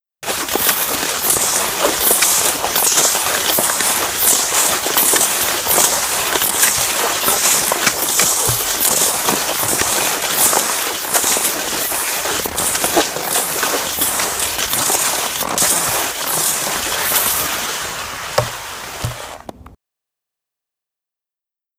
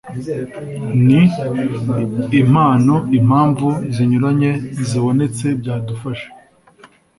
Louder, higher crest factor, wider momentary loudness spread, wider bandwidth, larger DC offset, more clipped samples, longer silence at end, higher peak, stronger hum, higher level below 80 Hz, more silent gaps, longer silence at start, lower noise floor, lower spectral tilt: about the same, -14 LUFS vs -16 LUFS; about the same, 18 dB vs 14 dB; second, 8 LU vs 13 LU; first, over 20 kHz vs 11.5 kHz; neither; neither; first, 2.1 s vs 0.3 s; about the same, 0 dBFS vs -2 dBFS; neither; about the same, -46 dBFS vs -48 dBFS; neither; first, 0.2 s vs 0.05 s; first, -88 dBFS vs -47 dBFS; second, -0.5 dB/octave vs -8 dB/octave